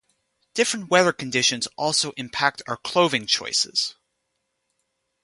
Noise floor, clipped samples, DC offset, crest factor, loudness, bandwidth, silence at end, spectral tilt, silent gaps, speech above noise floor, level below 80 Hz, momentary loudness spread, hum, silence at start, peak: -76 dBFS; under 0.1%; under 0.1%; 22 dB; -22 LUFS; 11.5 kHz; 1.3 s; -2 dB/octave; none; 53 dB; -66 dBFS; 7 LU; none; 0.55 s; -2 dBFS